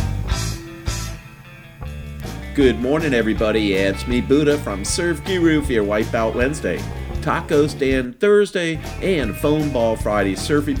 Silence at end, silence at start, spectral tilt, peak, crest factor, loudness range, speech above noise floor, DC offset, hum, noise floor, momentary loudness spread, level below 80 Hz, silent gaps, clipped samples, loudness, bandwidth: 0 s; 0 s; -5.5 dB/octave; -2 dBFS; 18 dB; 3 LU; 22 dB; under 0.1%; none; -40 dBFS; 12 LU; -32 dBFS; none; under 0.1%; -19 LUFS; 19.5 kHz